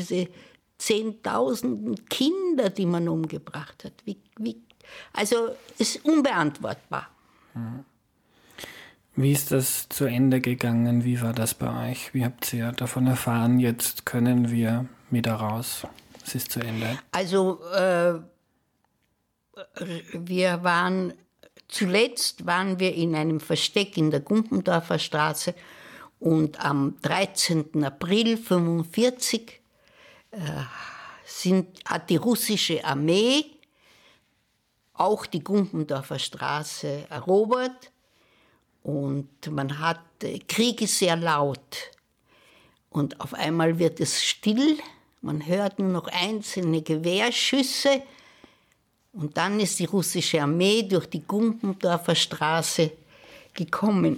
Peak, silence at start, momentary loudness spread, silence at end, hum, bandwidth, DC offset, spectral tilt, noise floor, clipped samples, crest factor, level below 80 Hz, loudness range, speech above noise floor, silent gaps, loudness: -10 dBFS; 0 s; 13 LU; 0 s; none; 19 kHz; under 0.1%; -4.5 dB/octave; -73 dBFS; under 0.1%; 16 dB; -66 dBFS; 4 LU; 48 dB; none; -25 LUFS